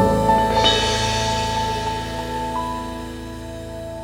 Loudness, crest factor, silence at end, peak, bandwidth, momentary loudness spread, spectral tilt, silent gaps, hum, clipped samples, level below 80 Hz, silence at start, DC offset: -20 LUFS; 20 dB; 0 s; -2 dBFS; 19 kHz; 16 LU; -4 dB/octave; none; none; under 0.1%; -34 dBFS; 0 s; under 0.1%